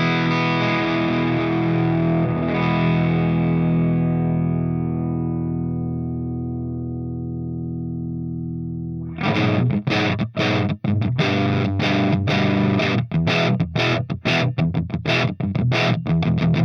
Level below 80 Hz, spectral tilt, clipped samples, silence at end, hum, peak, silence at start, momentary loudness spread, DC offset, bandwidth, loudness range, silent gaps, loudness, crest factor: -48 dBFS; -7.5 dB/octave; under 0.1%; 0 s; none; -6 dBFS; 0 s; 9 LU; under 0.1%; 6.6 kHz; 6 LU; none; -21 LUFS; 14 dB